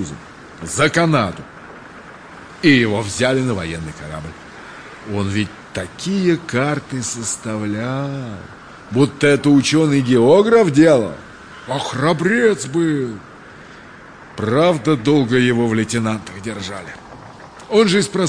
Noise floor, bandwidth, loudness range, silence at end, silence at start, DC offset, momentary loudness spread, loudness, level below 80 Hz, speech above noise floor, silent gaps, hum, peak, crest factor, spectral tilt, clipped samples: -39 dBFS; 10.5 kHz; 8 LU; 0 s; 0 s; under 0.1%; 23 LU; -17 LUFS; -50 dBFS; 23 dB; none; none; -2 dBFS; 16 dB; -5.5 dB/octave; under 0.1%